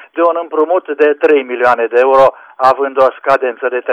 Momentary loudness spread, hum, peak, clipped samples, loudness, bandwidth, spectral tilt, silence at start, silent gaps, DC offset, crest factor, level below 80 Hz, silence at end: 5 LU; none; 0 dBFS; under 0.1%; -12 LUFS; 8.4 kHz; -5.5 dB/octave; 0.15 s; none; under 0.1%; 12 dB; -54 dBFS; 0 s